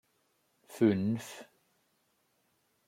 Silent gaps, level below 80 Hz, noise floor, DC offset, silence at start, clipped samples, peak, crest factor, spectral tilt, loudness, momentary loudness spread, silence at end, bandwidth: none; -78 dBFS; -75 dBFS; under 0.1%; 0.7 s; under 0.1%; -14 dBFS; 22 dB; -7 dB/octave; -31 LUFS; 22 LU; 1.45 s; 16 kHz